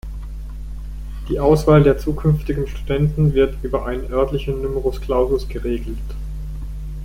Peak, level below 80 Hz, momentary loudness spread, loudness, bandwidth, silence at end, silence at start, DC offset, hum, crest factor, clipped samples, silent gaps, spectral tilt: -2 dBFS; -28 dBFS; 19 LU; -19 LUFS; 15.5 kHz; 0 s; 0.05 s; under 0.1%; none; 18 dB; under 0.1%; none; -8.5 dB/octave